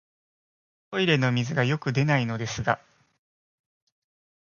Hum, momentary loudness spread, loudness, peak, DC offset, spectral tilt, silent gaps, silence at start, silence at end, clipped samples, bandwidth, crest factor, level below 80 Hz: none; 7 LU; -25 LUFS; -6 dBFS; under 0.1%; -5.5 dB/octave; none; 0.9 s; 1.65 s; under 0.1%; 7.2 kHz; 22 dB; -58 dBFS